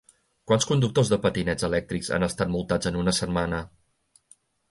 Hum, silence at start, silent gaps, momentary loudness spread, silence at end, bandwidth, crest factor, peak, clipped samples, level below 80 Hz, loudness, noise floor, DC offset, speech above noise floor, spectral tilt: none; 0.5 s; none; 6 LU; 1.05 s; 11.5 kHz; 18 dB; -8 dBFS; under 0.1%; -46 dBFS; -25 LUFS; -65 dBFS; under 0.1%; 40 dB; -5 dB/octave